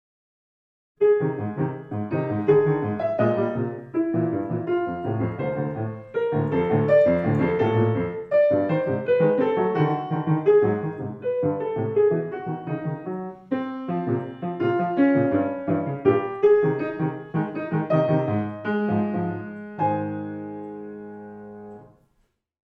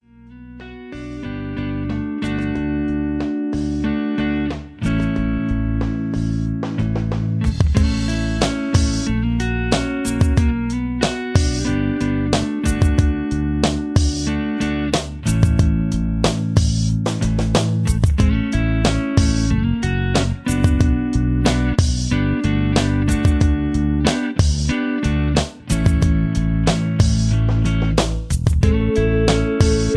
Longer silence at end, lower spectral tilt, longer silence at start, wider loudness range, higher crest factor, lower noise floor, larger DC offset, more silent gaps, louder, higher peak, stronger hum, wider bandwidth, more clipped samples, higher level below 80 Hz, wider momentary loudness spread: first, 0.85 s vs 0 s; first, -10.5 dB/octave vs -6 dB/octave; first, 1 s vs 0.25 s; about the same, 5 LU vs 4 LU; about the same, 18 dB vs 16 dB; first, -68 dBFS vs -41 dBFS; neither; neither; second, -23 LUFS vs -19 LUFS; second, -6 dBFS vs -2 dBFS; neither; second, 5 kHz vs 11 kHz; neither; second, -58 dBFS vs -24 dBFS; first, 12 LU vs 5 LU